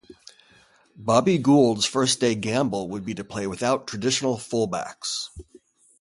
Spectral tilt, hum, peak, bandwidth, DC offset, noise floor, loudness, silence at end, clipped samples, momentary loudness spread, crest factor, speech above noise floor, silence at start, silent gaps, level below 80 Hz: -4.5 dB/octave; none; -4 dBFS; 11.5 kHz; under 0.1%; -57 dBFS; -23 LUFS; 0.6 s; under 0.1%; 13 LU; 20 dB; 34 dB; 0.1 s; none; -56 dBFS